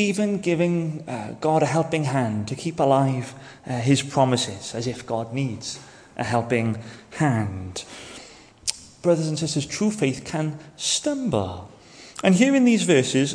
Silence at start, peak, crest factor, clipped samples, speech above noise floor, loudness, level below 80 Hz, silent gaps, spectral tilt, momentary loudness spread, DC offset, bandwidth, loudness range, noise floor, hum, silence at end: 0 s; 0 dBFS; 24 dB; under 0.1%; 23 dB; -23 LUFS; -58 dBFS; none; -5 dB/octave; 15 LU; under 0.1%; 10.5 kHz; 4 LU; -46 dBFS; none; 0 s